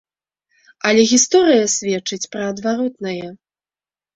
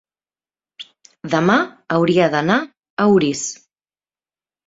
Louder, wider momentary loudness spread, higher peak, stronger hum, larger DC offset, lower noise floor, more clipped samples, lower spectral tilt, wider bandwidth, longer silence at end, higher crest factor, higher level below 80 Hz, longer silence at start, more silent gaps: about the same, -16 LUFS vs -17 LUFS; second, 14 LU vs 23 LU; about the same, -2 dBFS vs 0 dBFS; neither; neither; about the same, under -90 dBFS vs under -90 dBFS; neither; second, -2.5 dB/octave vs -5 dB/octave; about the same, 8.4 kHz vs 7.8 kHz; second, 0.8 s vs 1.15 s; about the same, 18 dB vs 18 dB; about the same, -62 dBFS vs -60 dBFS; about the same, 0.85 s vs 0.8 s; second, none vs 2.90-2.97 s